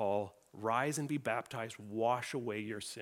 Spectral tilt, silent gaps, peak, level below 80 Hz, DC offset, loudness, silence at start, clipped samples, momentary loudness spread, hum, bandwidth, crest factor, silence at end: -5 dB/octave; none; -18 dBFS; -80 dBFS; under 0.1%; -37 LUFS; 0 s; under 0.1%; 8 LU; none; 17.5 kHz; 20 dB; 0 s